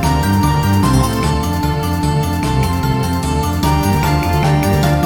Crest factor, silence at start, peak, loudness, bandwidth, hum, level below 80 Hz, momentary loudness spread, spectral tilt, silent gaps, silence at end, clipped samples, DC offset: 12 dB; 0 s; -2 dBFS; -15 LUFS; 19 kHz; none; -24 dBFS; 3 LU; -6 dB/octave; none; 0 s; under 0.1%; 0.1%